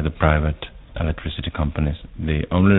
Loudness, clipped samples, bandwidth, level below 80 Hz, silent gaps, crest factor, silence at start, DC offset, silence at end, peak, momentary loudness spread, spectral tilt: -23 LUFS; under 0.1%; 4 kHz; -28 dBFS; none; 20 dB; 0 s; under 0.1%; 0 s; 0 dBFS; 10 LU; -11 dB/octave